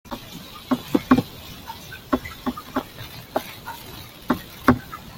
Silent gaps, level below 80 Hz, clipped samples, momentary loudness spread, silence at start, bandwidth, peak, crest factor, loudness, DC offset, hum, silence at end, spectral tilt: none; -48 dBFS; under 0.1%; 17 LU; 0.05 s; 17 kHz; -2 dBFS; 24 dB; -25 LUFS; under 0.1%; none; 0 s; -5.5 dB/octave